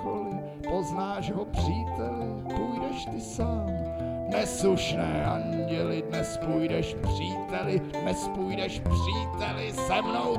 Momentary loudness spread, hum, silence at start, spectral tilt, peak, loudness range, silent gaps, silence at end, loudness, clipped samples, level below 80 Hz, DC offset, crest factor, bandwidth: 6 LU; none; 0 s; -5.5 dB/octave; -14 dBFS; 3 LU; none; 0 s; -30 LUFS; under 0.1%; -42 dBFS; under 0.1%; 16 dB; 15 kHz